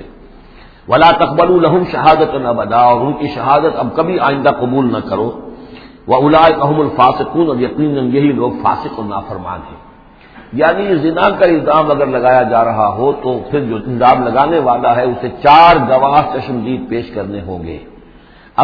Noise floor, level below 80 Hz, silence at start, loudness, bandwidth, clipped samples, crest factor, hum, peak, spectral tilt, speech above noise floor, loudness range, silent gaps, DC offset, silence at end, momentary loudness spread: -41 dBFS; -40 dBFS; 0 s; -12 LUFS; 5.4 kHz; 0.2%; 12 dB; none; 0 dBFS; -8.5 dB/octave; 29 dB; 5 LU; none; under 0.1%; 0 s; 14 LU